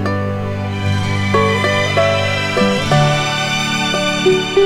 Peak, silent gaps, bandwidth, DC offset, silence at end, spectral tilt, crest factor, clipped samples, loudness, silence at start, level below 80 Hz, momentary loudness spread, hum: -2 dBFS; none; 15 kHz; under 0.1%; 0 s; -5 dB/octave; 14 dB; under 0.1%; -15 LUFS; 0 s; -42 dBFS; 6 LU; none